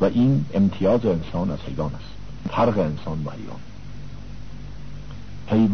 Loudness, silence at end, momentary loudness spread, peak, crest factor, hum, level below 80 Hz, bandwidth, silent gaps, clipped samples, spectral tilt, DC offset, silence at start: -23 LUFS; 0 s; 20 LU; -6 dBFS; 16 dB; none; -42 dBFS; 6.6 kHz; none; under 0.1%; -9 dB/octave; 2%; 0 s